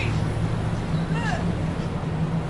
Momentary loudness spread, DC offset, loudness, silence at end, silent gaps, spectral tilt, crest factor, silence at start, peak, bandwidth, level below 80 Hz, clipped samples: 3 LU; under 0.1%; -26 LUFS; 0 s; none; -7 dB/octave; 12 dB; 0 s; -12 dBFS; 11.5 kHz; -36 dBFS; under 0.1%